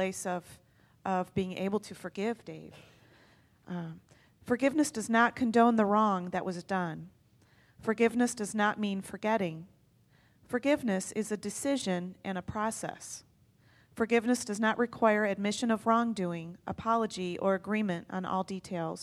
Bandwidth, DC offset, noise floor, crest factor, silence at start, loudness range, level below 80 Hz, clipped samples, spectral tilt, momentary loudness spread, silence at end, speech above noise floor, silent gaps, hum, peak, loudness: 14 kHz; under 0.1%; -65 dBFS; 20 dB; 0 s; 8 LU; -66 dBFS; under 0.1%; -5 dB/octave; 14 LU; 0 s; 34 dB; none; none; -10 dBFS; -31 LUFS